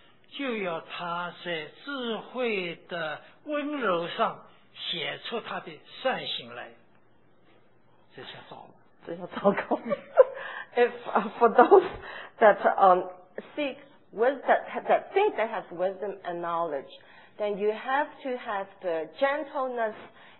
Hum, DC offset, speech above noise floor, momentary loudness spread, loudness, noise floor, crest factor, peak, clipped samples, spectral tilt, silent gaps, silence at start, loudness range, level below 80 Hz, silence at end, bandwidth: none; 0.1%; 36 dB; 20 LU; -27 LUFS; -64 dBFS; 26 dB; -2 dBFS; under 0.1%; -8 dB/octave; none; 0.35 s; 12 LU; -70 dBFS; 0.3 s; 4.2 kHz